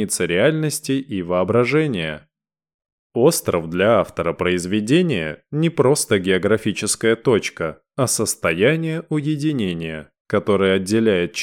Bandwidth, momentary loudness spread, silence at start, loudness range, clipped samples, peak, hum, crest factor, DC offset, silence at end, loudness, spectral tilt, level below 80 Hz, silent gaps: 17.5 kHz; 8 LU; 0 s; 2 LU; under 0.1%; -4 dBFS; none; 16 dB; under 0.1%; 0 s; -19 LUFS; -4.5 dB/octave; -52 dBFS; 2.74-2.79 s, 2.92-3.10 s, 10.20-10.25 s